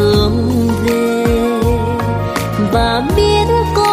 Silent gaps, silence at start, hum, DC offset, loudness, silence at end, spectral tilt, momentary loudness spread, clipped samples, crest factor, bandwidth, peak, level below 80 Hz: none; 0 s; none; under 0.1%; -14 LUFS; 0 s; -6 dB/octave; 5 LU; under 0.1%; 12 dB; 15.5 kHz; -2 dBFS; -24 dBFS